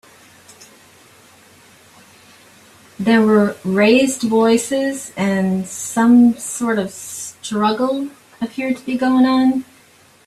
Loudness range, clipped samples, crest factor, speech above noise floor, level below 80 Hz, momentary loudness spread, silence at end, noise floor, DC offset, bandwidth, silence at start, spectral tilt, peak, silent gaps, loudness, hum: 5 LU; under 0.1%; 16 dB; 34 dB; -60 dBFS; 12 LU; 0.65 s; -50 dBFS; under 0.1%; 13.5 kHz; 3 s; -5 dB/octave; -2 dBFS; none; -17 LUFS; none